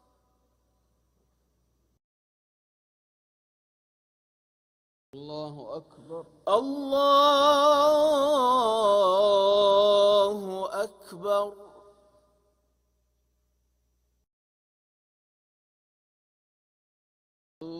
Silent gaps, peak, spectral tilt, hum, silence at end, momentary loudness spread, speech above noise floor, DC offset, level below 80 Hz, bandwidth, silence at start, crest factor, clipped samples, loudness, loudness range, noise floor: 14.33-17.61 s; -8 dBFS; -3.5 dB/octave; 60 Hz at -75 dBFS; 0 s; 20 LU; 49 dB; under 0.1%; -70 dBFS; 15.5 kHz; 5.15 s; 18 dB; under 0.1%; -22 LUFS; 18 LU; -73 dBFS